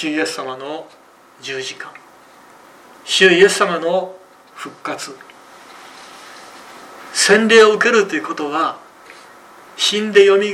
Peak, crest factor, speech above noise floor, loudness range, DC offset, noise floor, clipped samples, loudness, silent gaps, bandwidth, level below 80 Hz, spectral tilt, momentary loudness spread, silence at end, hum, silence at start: 0 dBFS; 18 dB; 29 dB; 11 LU; under 0.1%; -45 dBFS; under 0.1%; -14 LUFS; none; 14 kHz; -64 dBFS; -2.5 dB/octave; 27 LU; 0 s; none; 0 s